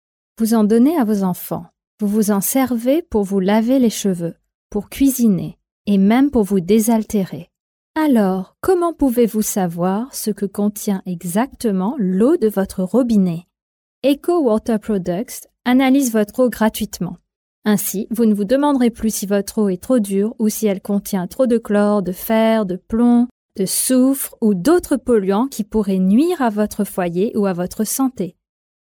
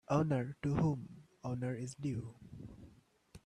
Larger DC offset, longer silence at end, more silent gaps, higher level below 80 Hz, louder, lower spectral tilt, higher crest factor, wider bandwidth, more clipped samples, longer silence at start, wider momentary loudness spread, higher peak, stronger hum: neither; first, 0.5 s vs 0.05 s; first, 1.87-1.98 s, 4.54-4.70 s, 5.72-5.85 s, 7.60-7.94 s, 13.62-14.02 s, 17.36-17.62 s, 23.31-23.49 s vs none; first, -48 dBFS vs -62 dBFS; first, -17 LUFS vs -38 LUFS; second, -5.5 dB/octave vs -8 dB/octave; second, 14 dB vs 20 dB; first, 20 kHz vs 10.5 kHz; neither; first, 0.4 s vs 0.1 s; second, 9 LU vs 20 LU; first, -4 dBFS vs -20 dBFS; neither